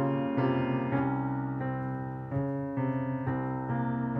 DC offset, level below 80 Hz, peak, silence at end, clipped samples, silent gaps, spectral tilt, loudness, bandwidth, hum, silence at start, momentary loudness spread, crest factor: under 0.1%; -60 dBFS; -16 dBFS; 0 s; under 0.1%; none; -11 dB/octave; -32 LUFS; 3.8 kHz; none; 0 s; 5 LU; 14 dB